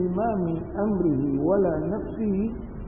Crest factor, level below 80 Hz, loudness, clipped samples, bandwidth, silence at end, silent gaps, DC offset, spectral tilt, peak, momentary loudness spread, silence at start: 14 dB; -42 dBFS; -25 LUFS; under 0.1%; 3.5 kHz; 0 s; none; 0.3%; -14 dB/octave; -12 dBFS; 6 LU; 0 s